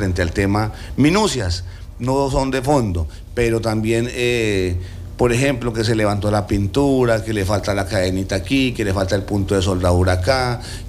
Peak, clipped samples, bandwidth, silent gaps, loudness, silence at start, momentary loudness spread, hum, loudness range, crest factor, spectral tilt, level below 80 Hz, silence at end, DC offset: -4 dBFS; under 0.1%; 15 kHz; none; -19 LUFS; 0 s; 7 LU; none; 1 LU; 14 dB; -6 dB/octave; -32 dBFS; 0 s; under 0.1%